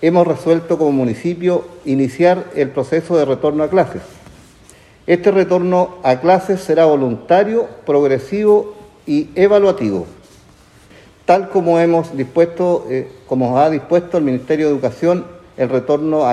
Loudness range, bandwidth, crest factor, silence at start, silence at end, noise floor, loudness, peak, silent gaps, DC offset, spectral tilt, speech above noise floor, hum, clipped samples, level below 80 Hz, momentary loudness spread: 3 LU; 12 kHz; 14 dB; 0 s; 0 s; -46 dBFS; -15 LUFS; 0 dBFS; none; under 0.1%; -7.5 dB/octave; 31 dB; none; under 0.1%; -52 dBFS; 8 LU